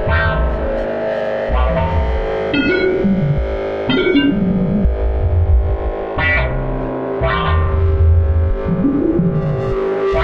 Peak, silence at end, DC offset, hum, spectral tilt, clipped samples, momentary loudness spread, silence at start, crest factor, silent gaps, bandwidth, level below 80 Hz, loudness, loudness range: -2 dBFS; 0 s; under 0.1%; none; -9 dB/octave; under 0.1%; 6 LU; 0 s; 12 dB; none; 5.6 kHz; -20 dBFS; -17 LUFS; 1 LU